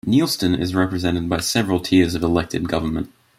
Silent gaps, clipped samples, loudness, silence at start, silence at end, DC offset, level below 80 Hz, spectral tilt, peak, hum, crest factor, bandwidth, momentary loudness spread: none; under 0.1%; -20 LUFS; 0.05 s; 0.3 s; under 0.1%; -44 dBFS; -5 dB/octave; -4 dBFS; none; 16 dB; 16 kHz; 6 LU